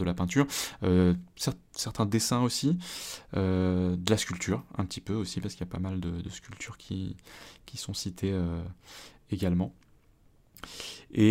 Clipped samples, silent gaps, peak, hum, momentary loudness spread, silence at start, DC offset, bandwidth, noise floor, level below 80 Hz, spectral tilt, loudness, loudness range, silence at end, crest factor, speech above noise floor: under 0.1%; none; -8 dBFS; none; 15 LU; 0 s; under 0.1%; 16 kHz; -61 dBFS; -54 dBFS; -5.5 dB/octave; -31 LUFS; 8 LU; 0 s; 24 dB; 32 dB